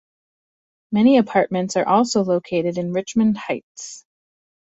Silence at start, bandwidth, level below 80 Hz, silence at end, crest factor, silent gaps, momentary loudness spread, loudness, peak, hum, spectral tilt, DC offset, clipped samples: 0.9 s; 8 kHz; -60 dBFS; 0.7 s; 18 dB; 3.63-3.75 s; 13 LU; -19 LUFS; -2 dBFS; none; -5.5 dB/octave; under 0.1%; under 0.1%